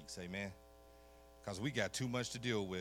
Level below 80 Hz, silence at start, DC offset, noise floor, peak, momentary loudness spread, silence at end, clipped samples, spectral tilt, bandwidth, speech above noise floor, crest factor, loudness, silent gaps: -66 dBFS; 0 s; under 0.1%; -62 dBFS; -22 dBFS; 23 LU; 0 s; under 0.1%; -4.5 dB/octave; 18 kHz; 21 dB; 22 dB; -42 LUFS; none